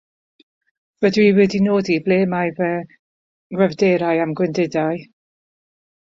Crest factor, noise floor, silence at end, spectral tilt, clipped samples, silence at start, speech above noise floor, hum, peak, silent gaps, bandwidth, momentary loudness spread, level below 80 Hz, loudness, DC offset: 16 dB; under -90 dBFS; 1 s; -7 dB/octave; under 0.1%; 1 s; over 73 dB; none; -4 dBFS; 2.99-3.50 s; 7.6 kHz; 9 LU; -58 dBFS; -18 LUFS; under 0.1%